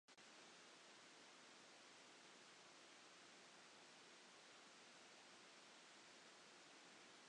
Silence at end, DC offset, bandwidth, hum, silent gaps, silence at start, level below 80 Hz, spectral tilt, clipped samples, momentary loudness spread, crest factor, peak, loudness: 0 s; under 0.1%; 10 kHz; none; none; 0.1 s; under -90 dBFS; -1 dB/octave; under 0.1%; 0 LU; 14 dB; -52 dBFS; -64 LUFS